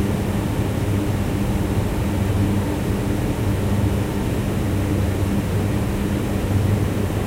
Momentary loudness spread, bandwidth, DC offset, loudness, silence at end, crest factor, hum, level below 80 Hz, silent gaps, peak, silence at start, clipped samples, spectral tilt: 2 LU; 16 kHz; under 0.1%; -22 LUFS; 0 s; 14 dB; none; -30 dBFS; none; -6 dBFS; 0 s; under 0.1%; -7 dB/octave